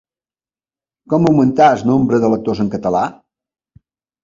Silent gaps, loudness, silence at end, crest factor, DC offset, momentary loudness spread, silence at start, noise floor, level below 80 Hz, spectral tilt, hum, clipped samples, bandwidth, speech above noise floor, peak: none; -14 LUFS; 1.1 s; 16 dB; under 0.1%; 8 LU; 1.1 s; under -90 dBFS; -50 dBFS; -8 dB/octave; none; under 0.1%; 7.6 kHz; over 77 dB; 0 dBFS